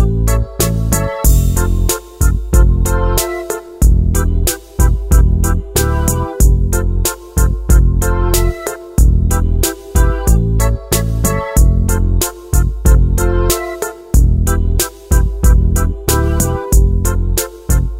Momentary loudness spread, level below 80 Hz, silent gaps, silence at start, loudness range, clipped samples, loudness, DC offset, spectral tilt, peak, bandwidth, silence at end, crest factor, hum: 4 LU; -14 dBFS; none; 0 s; 1 LU; under 0.1%; -14 LUFS; under 0.1%; -5 dB/octave; 0 dBFS; 16.5 kHz; 0 s; 12 dB; none